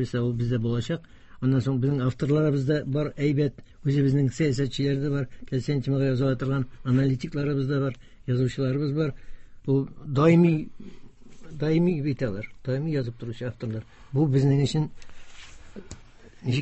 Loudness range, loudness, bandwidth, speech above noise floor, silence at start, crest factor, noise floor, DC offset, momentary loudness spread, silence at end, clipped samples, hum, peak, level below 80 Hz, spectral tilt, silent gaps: 3 LU; -26 LUFS; 8.4 kHz; 23 dB; 0 s; 18 dB; -48 dBFS; under 0.1%; 12 LU; 0 s; under 0.1%; none; -8 dBFS; -50 dBFS; -8 dB/octave; none